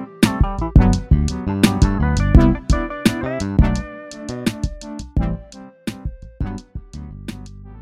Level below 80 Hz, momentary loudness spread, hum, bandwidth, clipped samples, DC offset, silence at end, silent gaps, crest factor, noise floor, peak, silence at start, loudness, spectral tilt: -22 dBFS; 18 LU; none; 15 kHz; under 0.1%; under 0.1%; 0 s; none; 18 dB; -39 dBFS; 0 dBFS; 0 s; -19 LUFS; -6.5 dB/octave